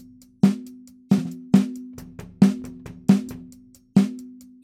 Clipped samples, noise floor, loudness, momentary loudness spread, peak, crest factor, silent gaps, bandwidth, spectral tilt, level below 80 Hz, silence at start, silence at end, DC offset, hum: under 0.1%; -49 dBFS; -22 LUFS; 20 LU; -2 dBFS; 20 dB; none; 14 kHz; -8 dB/octave; -56 dBFS; 0.45 s; 0.35 s; under 0.1%; none